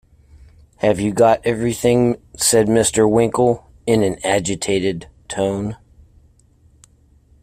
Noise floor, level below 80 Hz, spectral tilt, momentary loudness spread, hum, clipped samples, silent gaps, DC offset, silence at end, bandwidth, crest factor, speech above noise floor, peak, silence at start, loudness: -53 dBFS; -46 dBFS; -4.5 dB/octave; 10 LU; none; under 0.1%; none; under 0.1%; 1.7 s; 16 kHz; 16 dB; 36 dB; -2 dBFS; 0.85 s; -17 LUFS